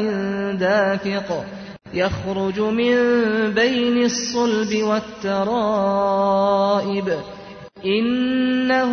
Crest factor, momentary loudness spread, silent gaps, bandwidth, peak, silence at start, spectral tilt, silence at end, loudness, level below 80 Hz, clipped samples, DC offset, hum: 14 dB; 10 LU; none; 6.6 kHz; -6 dBFS; 0 s; -5 dB/octave; 0 s; -20 LUFS; -52 dBFS; under 0.1%; under 0.1%; none